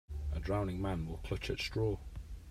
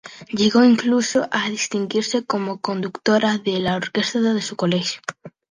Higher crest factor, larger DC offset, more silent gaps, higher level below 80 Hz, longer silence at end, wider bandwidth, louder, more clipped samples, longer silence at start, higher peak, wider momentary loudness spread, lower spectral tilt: about the same, 16 dB vs 16 dB; neither; neither; first, -44 dBFS vs -60 dBFS; second, 0 s vs 0.2 s; first, 14.5 kHz vs 10 kHz; second, -38 LUFS vs -20 LUFS; neither; about the same, 0.1 s vs 0.05 s; second, -20 dBFS vs -4 dBFS; about the same, 8 LU vs 10 LU; first, -6.5 dB/octave vs -4.5 dB/octave